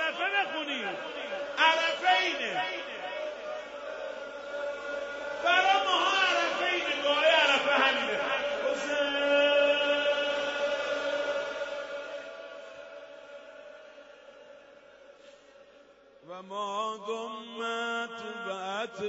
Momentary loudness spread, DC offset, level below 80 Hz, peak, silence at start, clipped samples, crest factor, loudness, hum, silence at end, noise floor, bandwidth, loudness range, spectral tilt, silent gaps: 19 LU; under 0.1%; -70 dBFS; -10 dBFS; 0 s; under 0.1%; 22 dB; -28 LUFS; none; 0 s; -57 dBFS; 8 kHz; 16 LU; -1.5 dB/octave; none